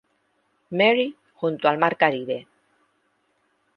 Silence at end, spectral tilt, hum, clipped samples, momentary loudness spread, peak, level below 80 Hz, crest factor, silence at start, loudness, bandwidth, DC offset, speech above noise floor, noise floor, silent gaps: 1.35 s; -7.5 dB/octave; none; under 0.1%; 12 LU; -2 dBFS; -74 dBFS; 22 dB; 0.7 s; -22 LUFS; 5.8 kHz; under 0.1%; 48 dB; -69 dBFS; none